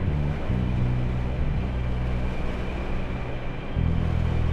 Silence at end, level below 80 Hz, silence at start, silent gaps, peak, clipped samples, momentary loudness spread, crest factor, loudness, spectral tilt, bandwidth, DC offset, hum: 0 s; -28 dBFS; 0 s; none; -12 dBFS; under 0.1%; 6 LU; 14 dB; -28 LUFS; -8.5 dB/octave; 7 kHz; under 0.1%; none